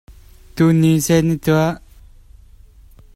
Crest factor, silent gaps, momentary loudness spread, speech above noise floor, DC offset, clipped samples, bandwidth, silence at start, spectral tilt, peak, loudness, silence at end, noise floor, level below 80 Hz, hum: 16 dB; none; 14 LU; 30 dB; under 0.1%; under 0.1%; 16 kHz; 0.1 s; -6.5 dB/octave; -2 dBFS; -16 LUFS; 1.35 s; -45 dBFS; -42 dBFS; none